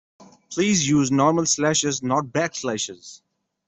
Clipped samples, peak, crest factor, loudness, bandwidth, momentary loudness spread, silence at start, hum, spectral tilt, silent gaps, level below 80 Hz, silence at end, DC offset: under 0.1%; -6 dBFS; 18 dB; -21 LUFS; 8.4 kHz; 10 LU; 0.2 s; none; -4 dB/octave; none; -58 dBFS; 0.5 s; under 0.1%